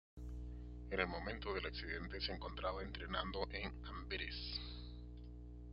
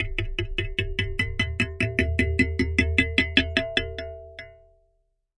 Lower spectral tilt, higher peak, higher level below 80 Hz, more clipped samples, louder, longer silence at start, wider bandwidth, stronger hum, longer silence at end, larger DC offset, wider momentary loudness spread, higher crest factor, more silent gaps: second, -3 dB/octave vs -5.5 dB/octave; second, -20 dBFS vs -2 dBFS; second, -52 dBFS vs -36 dBFS; neither; second, -45 LUFS vs -24 LUFS; first, 0.15 s vs 0 s; second, 5.8 kHz vs 11.5 kHz; first, 60 Hz at -50 dBFS vs none; second, 0 s vs 0.85 s; neither; second, 12 LU vs 15 LU; about the same, 24 dB vs 24 dB; neither